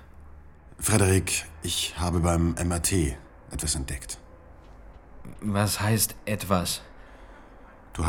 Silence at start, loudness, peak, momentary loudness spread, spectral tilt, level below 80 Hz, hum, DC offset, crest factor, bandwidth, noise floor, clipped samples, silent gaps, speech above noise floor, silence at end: 0 s; -26 LUFS; -6 dBFS; 15 LU; -4 dB/octave; -40 dBFS; none; under 0.1%; 22 dB; 17.5 kHz; -49 dBFS; under 0.1%; none; 23 dB; 0 s